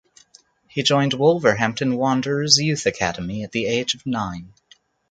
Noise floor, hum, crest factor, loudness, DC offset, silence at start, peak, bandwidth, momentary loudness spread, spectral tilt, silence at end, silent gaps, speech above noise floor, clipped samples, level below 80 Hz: -55 dBFS; none; 22 dB; -20 LUFS; under 0.1%; 0.75 s; 0 dBFS; 9.4 kHz; 11 LU; -4 dB/octave; 0.65 s; none; 34 dB; under 0.1%; -52 dBFS